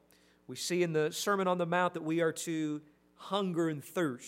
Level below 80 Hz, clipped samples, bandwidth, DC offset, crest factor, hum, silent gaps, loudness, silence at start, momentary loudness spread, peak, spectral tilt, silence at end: -80 dBFS; under 0.1%; 16 kHz; under 0.1%; 18 dB; none; none; -33 LUFS; 0.5 s; 8 LU; -16 dBFS; -4.5 dB/octave; 0 s